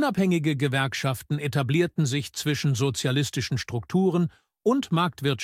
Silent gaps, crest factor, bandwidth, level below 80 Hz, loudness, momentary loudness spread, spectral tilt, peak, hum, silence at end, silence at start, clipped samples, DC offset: none; 14 dB; 16 kHz; -58 dBFS; -25 LUFS; 5 LU; -5.5 dB/octave; -10 dBFS; none; 0 s; 0 s; under 0.1%; under 0.1%